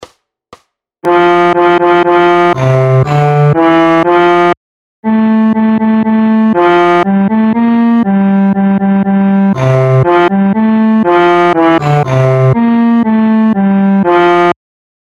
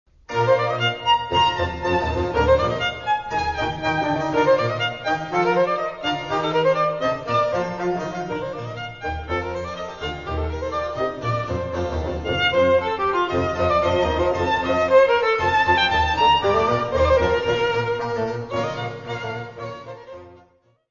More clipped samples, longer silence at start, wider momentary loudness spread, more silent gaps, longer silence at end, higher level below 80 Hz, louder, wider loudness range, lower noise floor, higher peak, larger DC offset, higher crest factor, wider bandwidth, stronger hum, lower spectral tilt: first, 0.4% vs under 0.1%; second, 0 s vs 0.3 s; second, 3 LU vs 12 LU; first, 4.57-5.03 s vs none; about the same, 0.5 s vs 0.55 s; second, -46 dBFS vs -38 dBFS; first, -9 LUFS vs -21 LUFS; second, 1 LU vs 9 LU; second, -44 dBFS vs -58 dBFS; first, 0 dBFS vs -4 dBFS; second, under 0.1% vs 0.2%; second, 8 dB vs 18 dB; about the same, 7.6 kHz vs 7.4 kHz; neither; first, -8.5 dB/octave vs -5.5 dB/octave